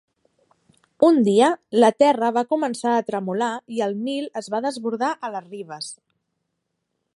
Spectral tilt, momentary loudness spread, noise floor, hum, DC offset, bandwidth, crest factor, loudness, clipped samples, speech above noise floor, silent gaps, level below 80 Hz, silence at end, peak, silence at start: -5 dB/octave; 16 LU; -77 dBFS; none; under 0.1%; 11.5 kHz; 20 dB; -21 LUFS; under 0.1%; 56 dB; none; -74 dBFS; 1.2 s; -4 dBFS; 1 s